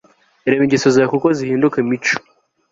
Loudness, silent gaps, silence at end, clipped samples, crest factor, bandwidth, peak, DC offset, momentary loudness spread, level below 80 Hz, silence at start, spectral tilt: -16 LUFS; none; 0.5 s; under 0.1%; 14 dB; 7.8 kHz; -2 dBFS; under 0.1%; 6 LU; -56 dBFS; 0.45 s; -5.5 dB/octave